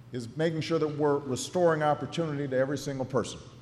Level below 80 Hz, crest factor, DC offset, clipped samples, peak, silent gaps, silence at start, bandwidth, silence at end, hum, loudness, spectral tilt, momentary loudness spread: -64 dBFS; 14 dB; under 0.1%; under 0.1%; -14 dBFS; none; 0 s; 13 kHz; 0 s; none; -29 LUFS; -5.5 dB/octave; 6 LU